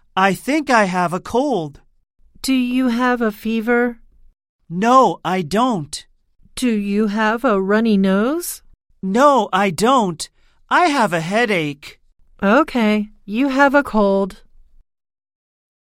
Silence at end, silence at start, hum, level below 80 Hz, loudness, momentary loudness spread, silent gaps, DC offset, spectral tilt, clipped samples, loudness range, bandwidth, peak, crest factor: 1.5 s; 0.15 s; none; -48 dBFS; -17 LUFS; 13 LU; 4.49-4.59 s; under 0.1%; -5 dB/octave; under 0.1%; 3 LU; 16.5 kHz; -2 dBFS; 18 dB